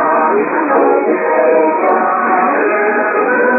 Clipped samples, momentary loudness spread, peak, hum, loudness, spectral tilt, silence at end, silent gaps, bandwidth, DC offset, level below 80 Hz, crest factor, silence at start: under 0.1%; 2 LU; 0 dBFS; none; -12 LUFS; -12.5 dB/octave; 0 s; none; 2.8 kHz; under 0.1%; -78 dBFS; 12 dB; 0 s